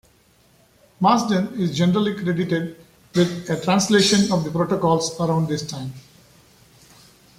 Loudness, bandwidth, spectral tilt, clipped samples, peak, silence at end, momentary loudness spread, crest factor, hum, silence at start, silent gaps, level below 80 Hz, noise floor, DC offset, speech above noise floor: -20 LUFS; 15 kHz; -5 dB/octave; under 0.1%; -4 dBFS; 1.4 s; 9 LU; 18 dB; none; 1 s; none; -56 dBFS; -57 dBFS; under 0.1%; 37 dB